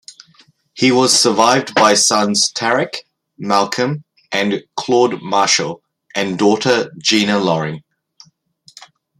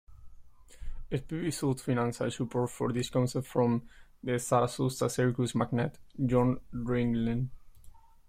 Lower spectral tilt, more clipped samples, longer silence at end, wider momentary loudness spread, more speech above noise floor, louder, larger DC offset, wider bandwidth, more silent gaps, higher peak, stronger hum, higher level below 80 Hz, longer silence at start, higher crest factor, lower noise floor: second, -3 dB/octave vs -6.5 dB/octave; neither; first, 1.4 s vs 0.3 s; first, 15 LU vs 9 LU; first, 37 dB vs 21 dB; first, -15 LUFS vs -31 LUFS; neither; about the same, 15.5 kHz vs 15.5 kHz; neither; first, 0 dBFS vs -12 dBFS; neither; second, -62 dBFS vs -50 dBFS; about the same, 0.1 s vs 0.1 s; about the same, 16 dB vs 18 dB; about the same, -52 dBFS vs -51 dBFS